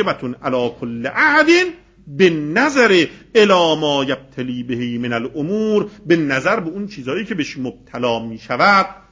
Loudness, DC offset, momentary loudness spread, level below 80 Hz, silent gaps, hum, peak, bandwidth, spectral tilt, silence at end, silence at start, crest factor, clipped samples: -17 LUFS; under 0.1%; 12 LU; -52 dBFS; none; none; 0 dBFS; 7.6 kHz; -5 dB/octave; 0.15 s; 0 s; 16 dB; under 0.1%